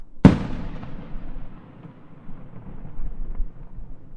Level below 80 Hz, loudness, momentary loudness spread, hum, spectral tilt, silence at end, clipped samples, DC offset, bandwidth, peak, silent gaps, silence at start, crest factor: -32 dBFS; -21 LUFS; 28 LU; none; -9 dB/octave; 0 s; under 0.1%; under 0.1%; 8.6 kHz; 0 dBFS; none; 0 s; 24 dB